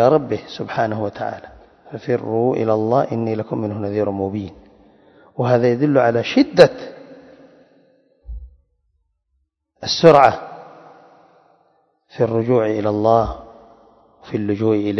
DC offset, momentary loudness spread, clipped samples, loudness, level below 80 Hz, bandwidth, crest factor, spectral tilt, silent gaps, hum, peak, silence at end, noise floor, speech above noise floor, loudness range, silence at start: under 0.1%; 23 LU; under 0.1%; -18 LUFS; -46 dBFS; 9 kHz; 20 dB; -6.5 dB/octave; none; none; 0 dBFS; 0 s; -70 dBFS; 53 dB; 4 LU; 0 s